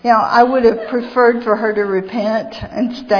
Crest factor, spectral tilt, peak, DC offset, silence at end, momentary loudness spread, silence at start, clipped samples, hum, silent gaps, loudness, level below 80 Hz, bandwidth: 14 dB; -6.5 dB/octave; 0 dBFS; under 0.1%; 0 s; 10 LU; 0.05 s; under 0.1%; none; none; -15 LUFS; -46 dBFS; 5.4 kHz